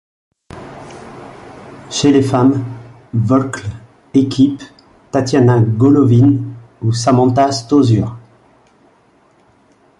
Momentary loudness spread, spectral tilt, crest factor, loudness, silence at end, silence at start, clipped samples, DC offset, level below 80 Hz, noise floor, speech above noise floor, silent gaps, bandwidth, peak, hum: 23 LU; -7 dB/octave; 14 dB; -13 LUFS; 1.8 s; 0.55 s; under 0.1%; under 0.1%; -46 dBFS; -52 dBFS; 40 dB; none; 11.5 kHz; -2 dBFS; none